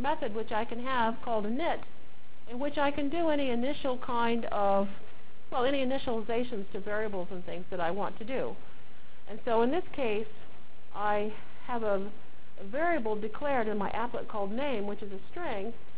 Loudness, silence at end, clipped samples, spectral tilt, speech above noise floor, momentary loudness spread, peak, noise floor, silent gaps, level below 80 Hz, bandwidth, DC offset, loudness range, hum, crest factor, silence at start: -33 LUFS; 0 s; under 0.1%; -9 dB/octave; 25 dB; 11 LU; -16 dBFS; -57 dBFS; none; -58 dBFS; 4 kHz; 4%; 3 LU; none; 18 dB; 0 s